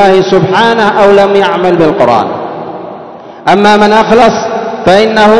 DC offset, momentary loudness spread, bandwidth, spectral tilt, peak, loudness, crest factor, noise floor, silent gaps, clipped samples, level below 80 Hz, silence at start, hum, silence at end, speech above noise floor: 1%; 16 LU; 11 kHz; -5.5 dB/octave; 0 dBFS; -7 LUFS; 6 dB; -27 dBFS; none; 8%; -40 dBFS; 0 s; none; 0 s; 21 dB